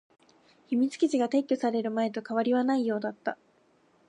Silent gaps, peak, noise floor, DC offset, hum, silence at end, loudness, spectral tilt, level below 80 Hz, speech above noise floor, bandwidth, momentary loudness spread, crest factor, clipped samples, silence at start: none; -14 dBFS; -65 dBFS; under 0.1%; none; 0.75 s; -28 LUFS; -5.5 dB/octave; -84 dBFS; 38 dB; 10.5 kHz; 8 LU; 14 dB; under 0.1%; 0.7 s